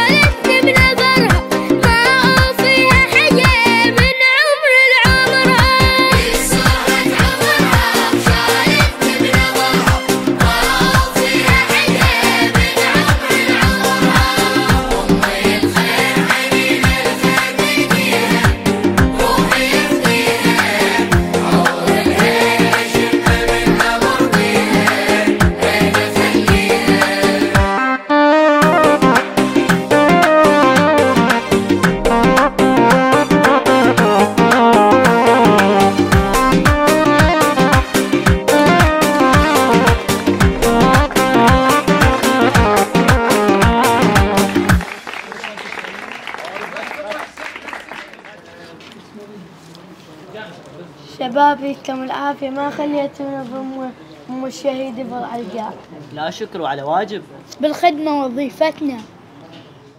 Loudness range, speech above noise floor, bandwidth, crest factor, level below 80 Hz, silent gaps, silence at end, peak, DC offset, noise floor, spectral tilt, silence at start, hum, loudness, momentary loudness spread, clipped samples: 13 LU; 19 dB; 16.5 kHz; 14 dB; -26 dBFS; none; 0.4 s; 0 dBFS; under 0.1%; -40 dBFS; -4.5 dB/octave; 0 s; none; -12 LUFS; 15 LU; under 0.1%